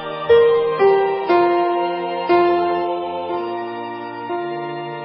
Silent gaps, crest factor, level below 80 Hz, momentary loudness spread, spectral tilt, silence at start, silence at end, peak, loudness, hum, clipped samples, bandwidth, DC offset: none; 14 dB; -54 dBFS; 12 LU; -10.5 dB/octave; 0 s; 0 s; -4 dBFS; -18 LUFS; none; under 0.1%; 5.6 kHz; under 0.1%